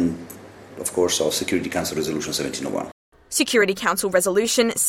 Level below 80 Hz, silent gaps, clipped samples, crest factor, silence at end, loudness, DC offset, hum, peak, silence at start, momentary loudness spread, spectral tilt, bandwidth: -58 dBFS; 2.92-3.12 s; under 0.1%; 18 dB; 0 s; -22 LUFS; under 0.1%; none; -4 dBFS; 0 s; 15 LU; -2.5 dB/octave; 16.5 kHz